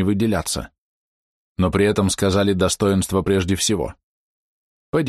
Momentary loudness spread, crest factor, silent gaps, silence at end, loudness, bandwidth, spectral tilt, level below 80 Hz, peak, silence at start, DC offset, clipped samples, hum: 9 LU; 14 dB; 0.78-1.55 s, 4.03-4.93 s; 0 s; -20 LUFS; 13 kHz; -5 dB/octave; -42 dBFS; -6 dBFS; 0 s; under 0.1%; under 0.1%; none